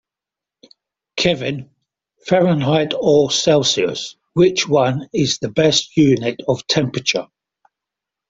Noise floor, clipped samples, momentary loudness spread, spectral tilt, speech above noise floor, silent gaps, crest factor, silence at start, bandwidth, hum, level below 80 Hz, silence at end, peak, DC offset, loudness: -87 dBFS; under 0.1%; 10 LU; -4.5 dB/octave; 71 dB; none; 16 dB; 1.15 s; 8 kHz; none; -54 dBFS; 1.05 s; -2 dBFS; under 0.1%; -17 LUFS